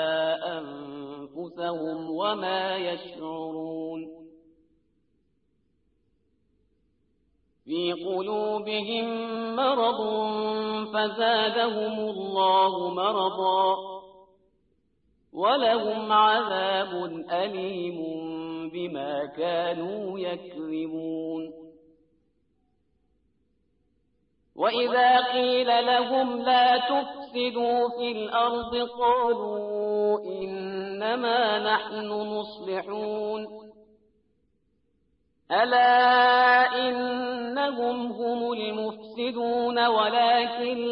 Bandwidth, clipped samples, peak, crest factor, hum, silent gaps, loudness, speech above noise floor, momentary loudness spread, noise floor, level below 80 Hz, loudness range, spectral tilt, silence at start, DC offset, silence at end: 5.6 kHz; under 0.1%; -10 dBFS; 18 dB; none; none; -26 LUFS; 47 dB; 14 LU; -72 dBFS; -70 dBFS; 13 LU; -8 dB/octave; 0 s; under 0.1%; 0 s